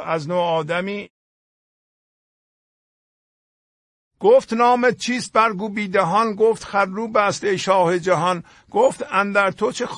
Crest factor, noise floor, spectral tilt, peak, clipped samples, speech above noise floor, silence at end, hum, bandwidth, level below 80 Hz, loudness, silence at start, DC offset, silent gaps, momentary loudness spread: 18 dB; under -90 dBFS; -4.5 dB/octave; -2 dBFS; under 0.1%; over 71 dB; 0 s; none; 11 kHz; -62 dBFS; -19 LUFS; 0 s; under 0.1%; 1.10-4.11 s; 8 LU